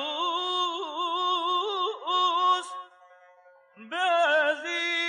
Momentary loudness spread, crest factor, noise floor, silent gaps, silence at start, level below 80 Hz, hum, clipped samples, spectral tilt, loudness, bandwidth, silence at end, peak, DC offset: 7 LU; 14 dB; -57 dBFS; none; 0 s; under -90 dBFS; none; under 0.1%; 0 dB/octave; -26 LUFS; 11 kHz; 0 s; -14 dBFS; under 0.1%